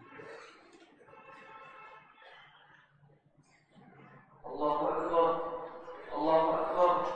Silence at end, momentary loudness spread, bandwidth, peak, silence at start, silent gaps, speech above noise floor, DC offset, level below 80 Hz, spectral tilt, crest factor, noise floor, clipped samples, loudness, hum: 0 s; 26 LU; 8.4 kHz; -14 dBFS; 0.1 s; none; 38 dB; under 0.1%; -68 dBFS; -6.5 dB/octave; 20 dB; -67 dBFS; under 0.1%; -31 LUFS; none